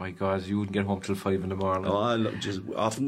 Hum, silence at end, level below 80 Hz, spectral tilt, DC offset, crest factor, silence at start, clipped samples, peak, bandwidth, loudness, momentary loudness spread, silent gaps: none; 0 s; -62 dBFS; -6 dB/octave; under 0.1%; 16 dB; 0 s; under 0.1%; -12 dBFS; 14.5 kHz; -29 LUFS; 4 LU; none